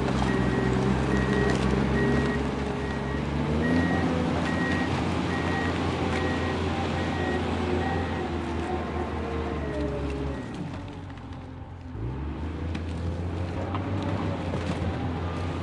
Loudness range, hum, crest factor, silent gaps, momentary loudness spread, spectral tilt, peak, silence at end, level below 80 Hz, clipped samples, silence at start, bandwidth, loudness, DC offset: 8 LU; none; 16 dB; none; 10 LU; -7 dB/octave; -10 dBFS; 0 s; -40 dBFS; under 0.1%; 0 s; 11 kHz; -28 LUFS; under 0.1%